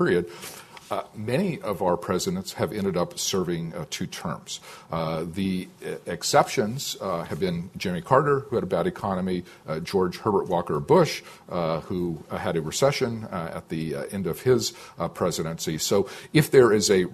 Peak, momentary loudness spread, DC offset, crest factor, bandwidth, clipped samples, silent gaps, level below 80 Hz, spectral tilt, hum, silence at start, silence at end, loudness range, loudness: -4 dBFS; 12 LU; under 0.1%; 22 dB; 14 kHz; under 0.1%; none; -52 dBFS; -5 dB/octave; none; 0 s; 0 s; 4 LU; -26 LUFS